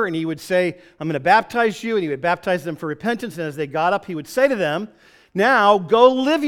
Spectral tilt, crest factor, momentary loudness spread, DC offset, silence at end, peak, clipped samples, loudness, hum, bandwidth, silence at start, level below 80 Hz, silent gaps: -5.5 dB/octave; 18 dB; 13 LU; under 0.1%; 0 s; 0 dBFS; under 0.1%; -19 LUFS; none; 17 kHz; 0 s; -60 dBFS; none